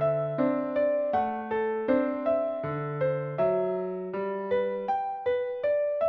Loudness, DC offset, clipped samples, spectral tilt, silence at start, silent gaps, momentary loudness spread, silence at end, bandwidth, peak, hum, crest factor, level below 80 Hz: -28 LUFS; under 0.1%; under 0.1%; -6.5 dB/octave; 0 s; none; 6 LU; 0 s; 5.6 kHz; -12 dBFS; none; 14 dB; -64 dBFS